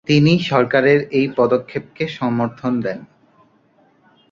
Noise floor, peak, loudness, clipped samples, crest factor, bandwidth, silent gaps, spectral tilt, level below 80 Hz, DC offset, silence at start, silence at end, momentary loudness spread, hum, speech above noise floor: -56 dBFS; 0 dBFS; -17 LUFS; under 0.1%; 18 dB; 7.4 kHz; none; -7 dB/octave; -56 dBFS; under 0.1%; 0.05 s; 1.25 s; 12 LU; none; 39 dB